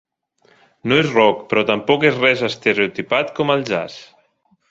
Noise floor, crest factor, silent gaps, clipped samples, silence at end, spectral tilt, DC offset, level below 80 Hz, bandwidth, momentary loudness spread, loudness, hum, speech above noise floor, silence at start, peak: -61 dBFS; 18 dB; none; under 0.1%; 0.65 s; -5.5 dB/octave; under 0.1%; -58 dBFS; 7.8 kHz; 9 LU; -17 LUFS; none; 44 dB; 0.85 s; 0 dBFS